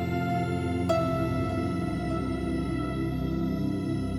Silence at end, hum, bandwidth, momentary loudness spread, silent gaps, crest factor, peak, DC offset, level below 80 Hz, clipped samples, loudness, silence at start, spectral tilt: 0 s; none; 14 kHz; 4 LU; none; 14 dB; -14 dBFS; under 0.1%; -42 dBFS; under 0.1%; -29 LUFS; 0 s; -8 dB/octave